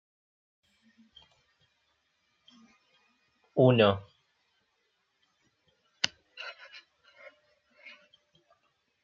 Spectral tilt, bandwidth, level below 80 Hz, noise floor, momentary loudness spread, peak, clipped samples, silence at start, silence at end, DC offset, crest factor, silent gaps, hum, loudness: -4.5 dB/octave; 7.4 kHz; -76 dBFS; -76 dBFS; 29 LU; -4 dBFS; under 0.1%; 3.55 s; 2.55 s; under 0.1%; 32 dB; none; none; -27 LUFS